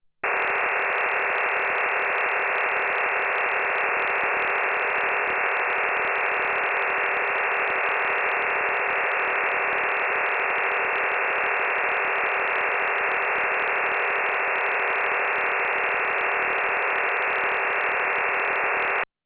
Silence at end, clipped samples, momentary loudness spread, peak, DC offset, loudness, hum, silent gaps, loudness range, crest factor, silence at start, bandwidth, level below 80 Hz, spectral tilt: 0.2 s; under 0.1%; 0 LU; -12 dBFS; under 0.1%; -22 LUFS; none; none; 0 LU; 12 dB; 0.25 s; 4 kHz; -64 dBFS; 1 dB/octave